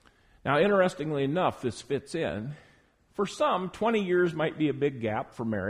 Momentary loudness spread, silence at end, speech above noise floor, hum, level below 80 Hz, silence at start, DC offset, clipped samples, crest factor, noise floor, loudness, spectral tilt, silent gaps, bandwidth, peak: 11 LU; 0 s; 35 dB; none; -60 dBFS; 0.45 s; under 0.1%; under 0.1%; 16 dB; -62 dBFS; -28 LUFS; -6 dB/octave; none; 12 kHz; -12 dBFS